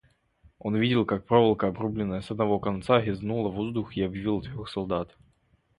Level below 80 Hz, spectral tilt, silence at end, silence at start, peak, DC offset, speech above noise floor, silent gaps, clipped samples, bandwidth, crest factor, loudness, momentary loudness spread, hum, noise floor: -52 dBFS; -8 dB/octave; 0.7 s; 0.65 s; -6 dBFS; under 0.1%; 40 dB; none; under 0.1%; 11 kHz; 22 dB; -27 LUFS; 9 LU; none; -66 dBFS